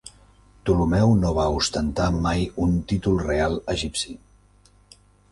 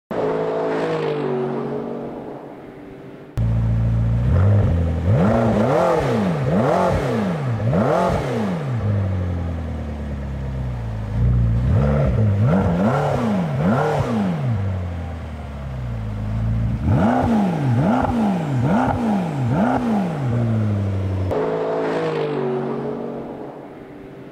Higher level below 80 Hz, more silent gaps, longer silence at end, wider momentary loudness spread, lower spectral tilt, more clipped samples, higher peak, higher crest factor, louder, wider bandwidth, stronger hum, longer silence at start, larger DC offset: about the same, -34 dBFS vs -32 dBFS; neither; first, 1.15 s vs 0 s; second, 9 LU vs 13 LU; second, -6 dB/octave vs -8.5 dB/octave; neither; about the same, -6 dBFS vs -6 dBFS; about the same, 16 dB vs 12 dB; second, -23 LUFS vs -20 LUFS; first, 11.5 kHz vs 10 kHz; first, 50 Hz at -40 dBFS vs none; about the same, 0.05 s vs 0.1 s; neither